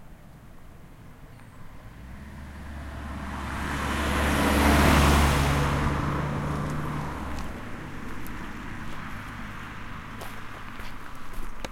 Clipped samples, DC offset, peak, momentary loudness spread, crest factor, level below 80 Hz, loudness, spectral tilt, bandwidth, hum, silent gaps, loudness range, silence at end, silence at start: under 0.1%; under 0.1%; -6 dBFS; 22 LU; 22 dB; -34 dBFS; -27 LUFS; -5 dB/octave; 16.5 kHz; none; none; 16 LU; 0 s; 0 s